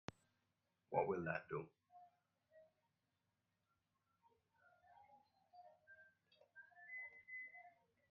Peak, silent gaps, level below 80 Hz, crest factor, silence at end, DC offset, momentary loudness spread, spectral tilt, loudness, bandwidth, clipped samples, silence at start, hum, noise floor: -24 dBFS; none; -86 dBFS; 28 dB; 0.4 s; under 0.1%; 26 LU; -5.5 dB/octave; -47 LUFS; 5.8 kHz; under 0.1%; 0.9 s; none; -89 dBFS